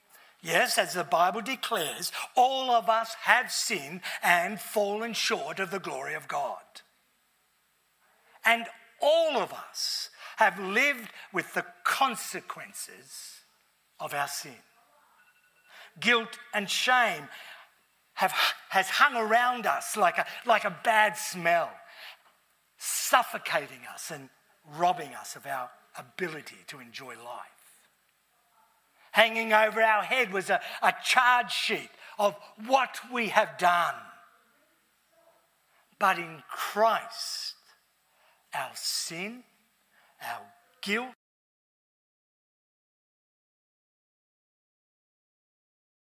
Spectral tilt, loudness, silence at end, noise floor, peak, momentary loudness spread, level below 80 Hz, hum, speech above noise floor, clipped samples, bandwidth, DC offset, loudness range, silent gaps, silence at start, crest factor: -1.5 dB/octave; -27 LUFS; 4.9 s; -70 dBFS; -4 dBFS; 19 LU; under -90 dBFS; none; 42 dB; under 0.1%; 16 kHz; under 0.1%; 12 LU; none; 0.45 s; 26 dB